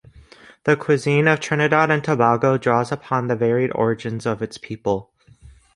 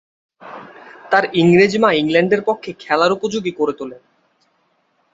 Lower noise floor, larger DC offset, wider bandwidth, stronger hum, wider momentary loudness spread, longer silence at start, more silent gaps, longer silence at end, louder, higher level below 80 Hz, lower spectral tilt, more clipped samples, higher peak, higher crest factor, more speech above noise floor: second, -48 dBFS vs -63 dBFS; neither; first, 11.5 kHz vs 8 kHz; neither; second, 9 LU vs 22 LU; first, 0.65 s vs 0.45 s; neither; second, 0.25 s vs 1.15 s; second, -20 LUFS vs -16 LUFS; about the same, -54 dBFS vs -58 dBFS; about the same, -6.5 dB/octave vs -6 dB/octave; neither; about the same, -2 dBFS vs -2 dBFS; about the same, 18 dB vs 16 dB; second, 29 dB vs 48 dB